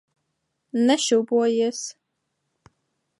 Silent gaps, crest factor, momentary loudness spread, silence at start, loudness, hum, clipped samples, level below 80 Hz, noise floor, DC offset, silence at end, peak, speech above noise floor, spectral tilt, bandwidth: none; 18 dB; 13 LU; 0.75 s; -22 LUFS; none; under 0.1%; -76 dBFS; -77 dBFS; under 0.1%; 1.3 s; -8 dBFS; 56 dB; -3 dB/octave; 11.5 kHz